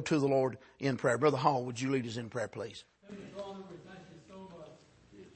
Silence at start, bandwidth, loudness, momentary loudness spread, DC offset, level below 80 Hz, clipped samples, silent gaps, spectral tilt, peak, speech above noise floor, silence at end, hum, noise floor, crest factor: 0 s; 8.8 kHz; -33 LUFS; 23 LU; under 0.1%; -72 dBFS; under 0.1%; none; -6 dB/octave; -12 dBFS; 25 dB; 0.1 s; none; -58 dBFS; 22 dB